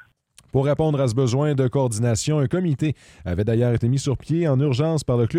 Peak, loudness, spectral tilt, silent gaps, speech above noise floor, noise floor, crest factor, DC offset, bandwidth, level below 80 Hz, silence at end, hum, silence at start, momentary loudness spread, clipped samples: -8 dBFS; -21 LUFS; -7 dB/octave; none; 35 dB; -56 dBFS; 12 dB; under 0.1%; 12 kHz; -46 dBFS; 0 s; none; 0.55 s; 5 LU; under 0.1%